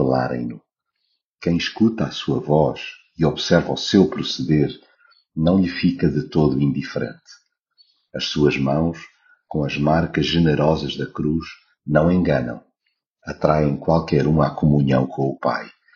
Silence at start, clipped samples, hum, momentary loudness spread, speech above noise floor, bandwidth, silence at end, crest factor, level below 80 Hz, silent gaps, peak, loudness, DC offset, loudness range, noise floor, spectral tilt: 0 s; under 0.1%; none; 13 LU; 55 dB; 7.2 kHz; 0.25 s; 18 dB; -42 dBFS; 1.24-1.35 s, 13.06-13.11 s; -2 dBFS; -20 LUFS; under 0.1%; 3 LU; -74 dBFS; -6 dB/octave